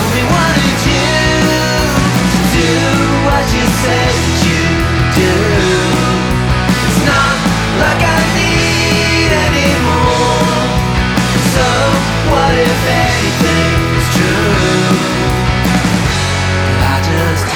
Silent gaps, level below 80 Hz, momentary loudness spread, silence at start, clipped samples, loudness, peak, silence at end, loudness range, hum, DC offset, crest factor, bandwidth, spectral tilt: none; -22 dBFS; 2 LU; 0 s; under 0.1%; -11 LUFS; 0 dBFS; 0 s; 1 LU; none; under 0.1%; 12 dB; over 20 kHz; -4.5 dB/octave